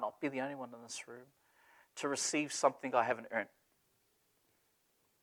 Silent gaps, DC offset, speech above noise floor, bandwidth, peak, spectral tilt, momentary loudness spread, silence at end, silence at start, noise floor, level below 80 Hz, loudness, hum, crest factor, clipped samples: none; under 0.1%; 39 dB; 19.5 kHz; -14 dBFS; -2.5 dB/octave; 16 LU; 1.75 s; 0 s; -77 dBFS; -90 dBFS; -37 LUFS; none; 26 dB; under 0.1%